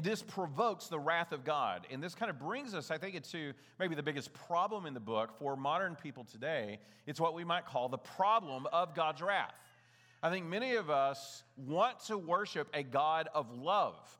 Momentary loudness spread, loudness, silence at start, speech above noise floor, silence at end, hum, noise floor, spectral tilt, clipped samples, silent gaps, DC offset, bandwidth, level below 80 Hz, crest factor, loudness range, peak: 10 LU; -37 LUFS; 0 s; 29 dB; 0.05 s; none; -66 dBFS; -5 dB/octave; under 0.1%; none; under 0.1%; 18.5 kHz; under -90 dBFS; 18 dB; 4 LU; -18 dBFS